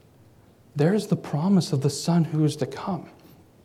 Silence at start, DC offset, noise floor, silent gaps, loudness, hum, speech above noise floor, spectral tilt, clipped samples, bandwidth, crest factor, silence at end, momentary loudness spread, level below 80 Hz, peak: 0.75 s; under 0.1%; -54 dBFS; none; -24 LUFS; none; 31 dB; -6.5 dB/octave; under 0.1%; 14 kHz; 16 dB; 0.55 s; 10 LU; -66 dBFS; -8 dBFS